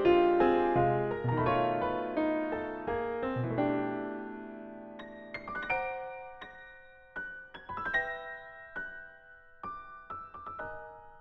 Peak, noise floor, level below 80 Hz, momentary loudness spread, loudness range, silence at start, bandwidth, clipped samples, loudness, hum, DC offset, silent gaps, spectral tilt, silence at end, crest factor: -14 dBFS; -55 dBFS; -58 dBFS; 19 LU; 9 LU; 0 s; 5.8 kHz; under 0.1%; -32 LUFS; none; under 0.1%; none; -9 dB/octave; 0 s; 18 dB